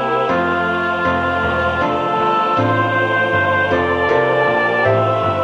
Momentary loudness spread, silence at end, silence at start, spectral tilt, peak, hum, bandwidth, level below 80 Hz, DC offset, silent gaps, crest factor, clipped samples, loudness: 2 LU; 0 s; 0 s; -7 dB/octave; -2 dBFS; none; 9.6 kHz; -42 dBFS; under 0.1%; none; 14 dB; under 0.1%; -16 LUFS